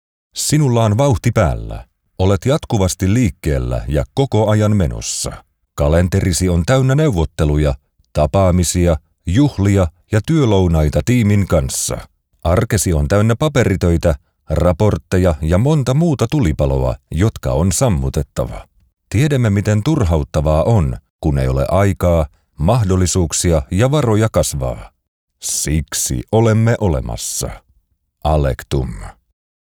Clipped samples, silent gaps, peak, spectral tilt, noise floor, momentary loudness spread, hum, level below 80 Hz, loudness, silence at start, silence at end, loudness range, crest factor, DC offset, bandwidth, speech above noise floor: under 0.1%; 21.10-21.19 s, 25.08-25.28 s; -2 dBFS; -6 dB/octave; -61 dBFS; 8 LU; none; -26 dBFS; -16 LUFS; 0.35 s; 0.65 s; 2 LU; 12 dB; under 0.1%; 18 kHz; 46 dB